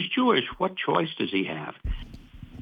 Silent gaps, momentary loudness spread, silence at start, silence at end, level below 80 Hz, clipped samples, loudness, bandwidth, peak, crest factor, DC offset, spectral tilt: none; 22 LU; 0 s; 0 s; -40 dBFS; under 0.1%; -27 LUFS; 5.2 kHz; -8 dBFS; 20 dB; under 0.1%; -7.5 dB/octave